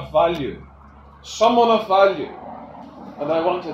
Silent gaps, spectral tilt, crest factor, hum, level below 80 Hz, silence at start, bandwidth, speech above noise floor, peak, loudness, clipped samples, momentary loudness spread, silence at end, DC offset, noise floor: none; -5 dB/octave; 18 dB; none; -48 dBFS; 0 s; 13 kHz; 27 dB; -2 dBFS; -19 LUFS; under 0.1%; 23 LU; 0 s; under 0.1%; -45 dBFS